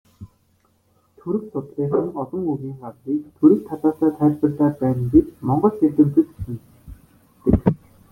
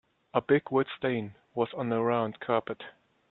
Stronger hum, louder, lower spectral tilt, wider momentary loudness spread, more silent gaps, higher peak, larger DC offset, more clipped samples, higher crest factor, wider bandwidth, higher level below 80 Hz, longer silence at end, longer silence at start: neither; first, -20 LUFS vs -30 LUFS; first, -11.5 dB/octave vs -10 dB/octave; first, 16 LU vs 13 LU; neither; first, -2 dBFS vs -10 dBFS; neither; neither; about the same, 18 dB vs 20 dB; second, 2.5 kHz vs 4.2 kHz; first, -40 dBFS vs -72 dBFS; about the same, 0.35 s vs 0.4 s; second, 0.2 s vs 0.35 s